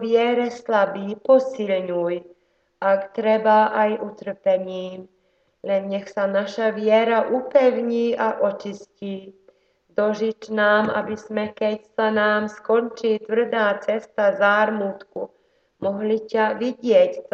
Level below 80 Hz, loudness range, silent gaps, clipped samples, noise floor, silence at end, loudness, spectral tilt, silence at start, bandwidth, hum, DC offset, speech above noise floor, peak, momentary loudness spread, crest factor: -70 dBFS; 3 LU; none; under 0.1%; -65 dBFS; 0.1 s; -21 LUFS; -6 dB/octave; 0 s; 7.4 kHz; none; under 0.1%; 44 dB; -4 dBFS; 14 LU; 18 dB